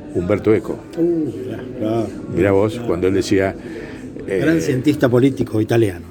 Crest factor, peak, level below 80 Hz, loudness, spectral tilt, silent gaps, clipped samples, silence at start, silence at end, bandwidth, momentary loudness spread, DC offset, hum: 18 dB; 0 dBFS; -46 dBFS; -18 LUFS; -7 dB/octave; none; under 0.1%; 0 s; 0 s; 17.5 kHz; 12 LU; under 0.1%; none